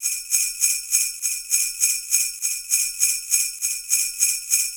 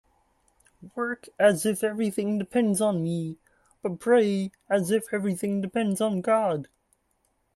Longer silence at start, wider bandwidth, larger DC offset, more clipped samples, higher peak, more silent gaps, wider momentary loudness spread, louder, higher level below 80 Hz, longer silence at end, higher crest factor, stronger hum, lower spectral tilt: second, 0 s vs 0.8 s; first, over 20 kHz vs 13.5 kHz; neither; neither; first, -4 dBFS vs -8 dBFS; neither; second, 4 LU vs 11 LU; first, -20 LUFS vs -26 LUFS; first, -62 dBFS vs -68 dBFS; second, 0 s vs 0.9 s; about the same, 20 dB vs 20 dB; neither; second, 6 dB/octave vs -5.5 dB/octave